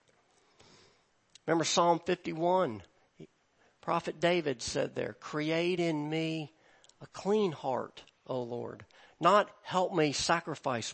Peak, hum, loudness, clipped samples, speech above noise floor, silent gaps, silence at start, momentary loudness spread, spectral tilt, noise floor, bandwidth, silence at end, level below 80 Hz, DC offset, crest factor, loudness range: -12 dBFS; none; -31 LUFS; under 0.1%; 38 dB; none; 1.5 s; 15 LU; -4.5 dB/octave; -69 dBFS; 8.8 kHz; 0 s; -68 dBFS; under 0.1%; 22 dB; 3 LU